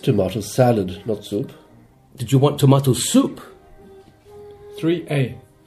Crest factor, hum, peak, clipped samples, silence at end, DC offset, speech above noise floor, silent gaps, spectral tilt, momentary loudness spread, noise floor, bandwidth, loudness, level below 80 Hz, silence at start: 18 dB; none; -2 dBFS; under 0.1%; 0.3 s; under 0.1%; 32 dB; none; -6 dB/octave; 13 LU; -50 dBFS; 15.5 kHz; -19 LUFS; -54 dBFS; 0.05 s